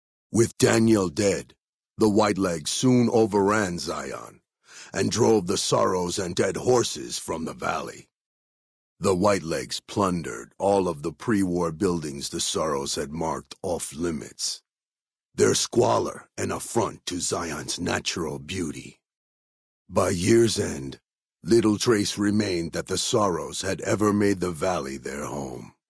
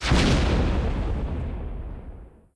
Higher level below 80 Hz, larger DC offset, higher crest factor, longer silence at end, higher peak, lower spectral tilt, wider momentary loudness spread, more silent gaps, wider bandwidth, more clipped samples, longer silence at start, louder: second, -54 dBFS vs -28 dBFS; neither; about the same, 20 dB vs 16 dB; about the same, 0.2 s vs 0.25 s; about the same, -6 dBFS vs -8 dBFS; about the same, -4.5 dB/octave vs -5.5 dB/octave; second, 11 LU vs 19 LU; first, 1.69-1.80 s, 8.16-8.97 s, 14.88-14.92 s, 19.17-19.85 s vs none; about the same, 11 kHz vs 11 kHz; neither; first, 0.35 s vs 0 s; about the same, -25 LUFS vs -25 LUFS